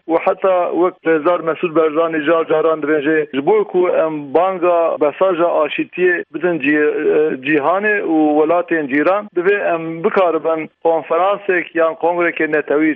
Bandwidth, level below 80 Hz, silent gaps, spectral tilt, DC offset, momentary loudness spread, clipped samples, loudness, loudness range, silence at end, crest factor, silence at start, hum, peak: 4 kHz; -68 dBFS; none; -9 dB/octave; under 0.1%; 3 LU; under 0.1%; -16 LUFS; 1 LU; 0 s; 14 dB; 0.1 s; none; -2 dBFS